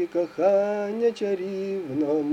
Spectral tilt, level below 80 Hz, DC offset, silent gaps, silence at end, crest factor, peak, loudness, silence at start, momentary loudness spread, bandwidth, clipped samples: -7 dB/octave; -72 dBFS; under 0.1%; none; 0 s; 14 dB; -10 dBFS; -25 LUFS; 0 s; 7 LU; 9.2 kHz; under 0.1%